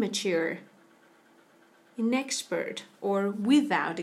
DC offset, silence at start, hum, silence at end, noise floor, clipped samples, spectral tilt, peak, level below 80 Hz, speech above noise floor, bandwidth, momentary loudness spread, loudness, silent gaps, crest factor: under 0.1%; 0 s; none; 0 s; -60 dBFS; under 0.1%; -4 dB/octave; -12 dBFS; -84 dBFS; 32 dB; 14 kHz; 12 LU; -28 LUFS; none; 18 dB